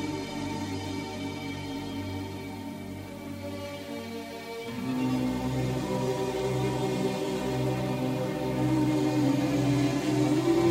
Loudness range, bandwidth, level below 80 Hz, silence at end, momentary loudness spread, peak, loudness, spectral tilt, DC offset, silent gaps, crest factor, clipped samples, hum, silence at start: 9 LU; 16 kHz; -52 dBFS; 0 s; 12 LU; -14 dBFS; -30 LUFS; -6.5 dB/octave; under 0.1%; none; 16 dB; under 0.1%; none; 0 s